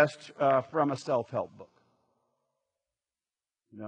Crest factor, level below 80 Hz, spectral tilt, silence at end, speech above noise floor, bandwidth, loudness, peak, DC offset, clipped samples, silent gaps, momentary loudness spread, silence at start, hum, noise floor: 22 dB; -82 dBFS; -6.5 dB/octave; 0 s; over 61 dB; 9.6 kHz; -29 LUFS; -10 dBFS; under 0.1%; under 0.1%; none; 9 LU; 0 s; none; under -90 dBFS